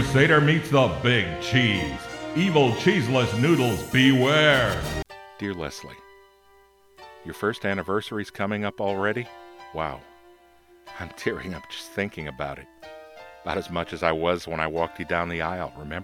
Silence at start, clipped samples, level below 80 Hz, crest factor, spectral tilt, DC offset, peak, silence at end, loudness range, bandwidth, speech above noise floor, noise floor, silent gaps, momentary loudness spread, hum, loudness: 0 s; under 0.1%; -48 dBFS; 20 dB; -5.5 dB/octave; under 0.1%; -4 dBFS; 0 s; 12 LU; 17.5 kHz; 33 dB; -57 dBFS; none; 21 LU; none; -24 LUFS